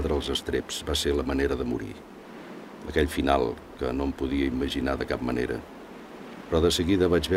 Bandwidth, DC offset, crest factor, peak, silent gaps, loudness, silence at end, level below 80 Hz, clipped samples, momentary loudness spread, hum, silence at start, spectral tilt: 16 kHz; under 0.1%; 20 dB; -6 dBFS; none; -27 LUFS; 0 s; -38 dBFS; under 0.1%; 19 LU; none; 0 s; -5 dB/octave